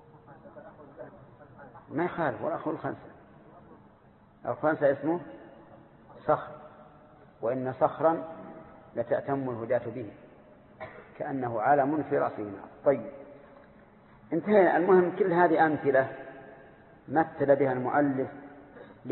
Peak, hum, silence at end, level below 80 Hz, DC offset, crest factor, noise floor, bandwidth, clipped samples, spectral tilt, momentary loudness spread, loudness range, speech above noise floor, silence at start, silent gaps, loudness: -8 dBFS; none; 0 s; -66 dBFS; under 0.1%; 20 dB; -58 dBFS; 4.3 kHz; under 0.1%; -11 dB/octave; 25 LU; 10 LU; 31 dB; 0.3 s; none; -28 LUFS